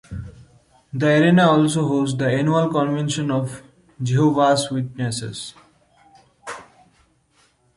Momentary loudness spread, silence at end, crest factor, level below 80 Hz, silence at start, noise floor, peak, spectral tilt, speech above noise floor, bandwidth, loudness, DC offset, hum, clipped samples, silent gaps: 21 LU; 1.15 s; 18 dB; -52 dBFS; 0.1 s; -61 dBFS; -4 dBFS; -6 dB/octave; 42 dB; 11.5 kHz; -19 LUFS; under 0.1%; none; under 0.1%; none